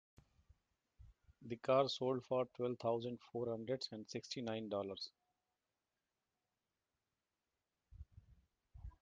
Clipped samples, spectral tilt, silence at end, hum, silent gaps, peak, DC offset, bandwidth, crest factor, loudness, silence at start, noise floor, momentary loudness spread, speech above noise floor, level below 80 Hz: under 0.1%; -5.5 dB/octave; 0.1 s; none; none; -22 dBFS; under 0.1%; 9.2 kHz; 22 dB; -42 LUFS; 1 s; under -90 dBFS; 24 LU; over 49 dB; -68 dBFS